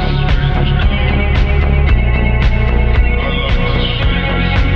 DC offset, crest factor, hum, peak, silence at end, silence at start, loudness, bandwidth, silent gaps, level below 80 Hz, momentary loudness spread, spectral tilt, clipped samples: under 0.1%; 10 dB; none; -2 dBFS; 0 s; 0 s; -14 LUFS; 5.8 kHz; none; -14 dBFS; 2 LU; -8 dB/octave; under 0.1%